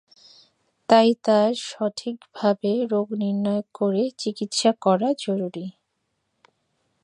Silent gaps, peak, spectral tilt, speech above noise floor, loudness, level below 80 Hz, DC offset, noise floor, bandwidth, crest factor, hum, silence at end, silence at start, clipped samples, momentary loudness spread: none; -2 dBFS; -5 dB/octave; 53 dB; -22 LUFS; -76 dBFS; under 0.1%; -75 dBFS; 11 kHz; 20 dB; none; 1.35 s; 0.9 s; under 0.1%; 13 LU